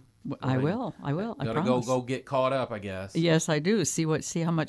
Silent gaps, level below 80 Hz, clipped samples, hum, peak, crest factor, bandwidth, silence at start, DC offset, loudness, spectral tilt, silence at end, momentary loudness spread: none; -62 dBFS; under 0.1%; none; -10 dBFS; 18 dB; 11 kHz; 0.25 s; under 0.1%; -28 LUFS; -5.5 dB/octave; 0 s; 8 LU